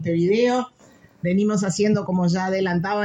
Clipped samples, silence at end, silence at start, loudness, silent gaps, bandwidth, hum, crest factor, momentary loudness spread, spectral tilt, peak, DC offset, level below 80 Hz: under 0.1%; 0 s; 0 s; -21 LUFS; none; 10 kHz; none; 12 dB; 6 LU; -6 dB/octave; -8 dBFS; under 0.1%; -58 dBFS